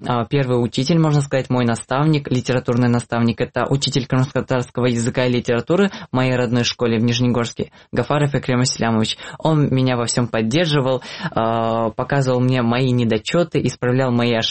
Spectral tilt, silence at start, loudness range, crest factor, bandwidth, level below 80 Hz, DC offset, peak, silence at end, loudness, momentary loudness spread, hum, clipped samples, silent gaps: -6 dB/octave; 0 s; 1 LU; 14 dB; 8.8 kHz; -48 dBFS; 0.4%; -4 dBFS; 0 s; -19 LUFS; 4 LU; none; under 0.1%; none